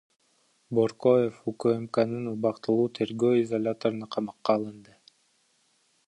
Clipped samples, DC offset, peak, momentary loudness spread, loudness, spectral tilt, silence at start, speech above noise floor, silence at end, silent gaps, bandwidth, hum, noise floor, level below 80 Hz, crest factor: under 0.1%; under 0.1%; -8 dBFS; 7 LU; -27 LUFS; -7.5 dB/octave; 0.7 s; 42 dB; 1.25 s; none; 10.5 kHz; none; -69 dBFS; -72 dBFS; 20 dB